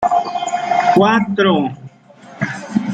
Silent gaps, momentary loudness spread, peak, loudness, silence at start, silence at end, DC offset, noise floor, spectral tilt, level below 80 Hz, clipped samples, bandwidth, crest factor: none; 12 LU; -2 dBFS; -16 LUFS; 0 s; 0 s; under 0.1%; -41 dBFS; -5.5 dB/octave; -56 dBFS; under 0.1%; 9.2 kHz; 14 dB